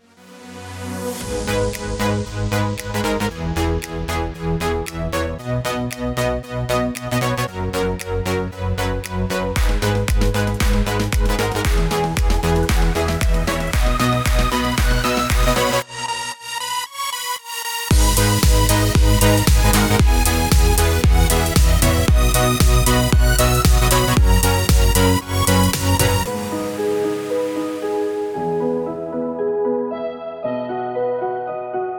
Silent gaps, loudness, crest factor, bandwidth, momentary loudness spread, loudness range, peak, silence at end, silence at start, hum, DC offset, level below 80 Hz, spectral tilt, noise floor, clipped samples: none; -19 LUFS; 16 dB; 19 kHz; 9 LU; 7 LU; 0 dBFS; 0 s; 0.3 s; none; under 0.1%; -22 dBFS; -4.5 dB/octave; -42 dBFS; under 0.1%